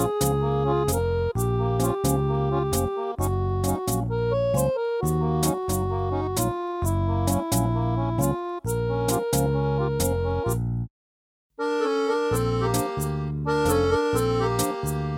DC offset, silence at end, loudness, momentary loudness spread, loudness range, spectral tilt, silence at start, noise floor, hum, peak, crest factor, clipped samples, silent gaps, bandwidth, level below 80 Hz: under 0.1%; 0 s; -25 LUFS; 4 LU; 2 LU; -6 dB/octave; 0 s; under -90 dBFS; none; -10 dBFS; 14 dB; under 0.1%; 10.90-11.50 s; 17.5 kHz; -38 dBFS